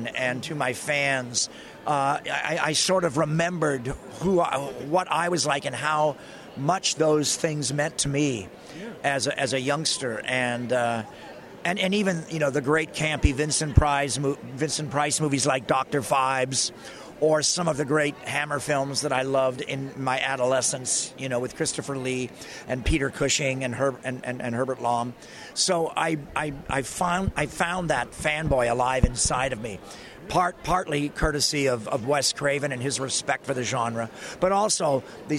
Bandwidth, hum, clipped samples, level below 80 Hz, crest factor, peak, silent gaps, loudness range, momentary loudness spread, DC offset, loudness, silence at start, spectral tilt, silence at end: 15.5 kHz; none; under 0.1%; -40 dBFS; 20 dB; -6 dBFS; none; 3 LU; 8 LU; under 0.1%; -25 LUFS; 0 s; -3.5 dB/octave; 0 s